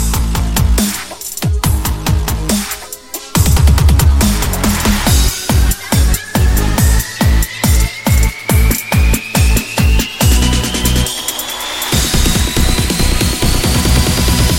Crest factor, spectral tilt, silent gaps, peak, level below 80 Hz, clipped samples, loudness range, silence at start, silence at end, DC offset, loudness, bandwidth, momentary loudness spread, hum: 12 dB; -4 dB/octave; none; 0 dBFS; -14 dBFS; under 0.1%; 2 LU; 0 s; 0 s; 0.6%; -13 LUFS; 17 kHz; 6 LU; none